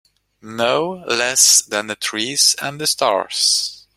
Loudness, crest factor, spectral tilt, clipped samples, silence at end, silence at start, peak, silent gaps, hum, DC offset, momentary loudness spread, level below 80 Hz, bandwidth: -15 LUFS; 18 dB; -0.5 dB/octave; under 0.1%; 0.15 s; 0.45 s; 0 dBFS; none; none; under 0.1%; 11 LU; -64 dBFS; 16.5 kHz